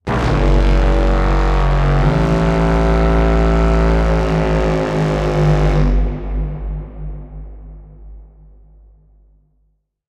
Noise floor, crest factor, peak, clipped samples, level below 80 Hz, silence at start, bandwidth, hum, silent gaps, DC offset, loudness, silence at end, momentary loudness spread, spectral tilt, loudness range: -62 dBFS; 12 dB; -2 dBFS; under 0.1%; -18 dBFS; 0.05 s; 8.2 kHz; none; none; under 0.1%; -16 LUFS; 1.85 s; 14 LU; -7.5 dB/octave; 14 LU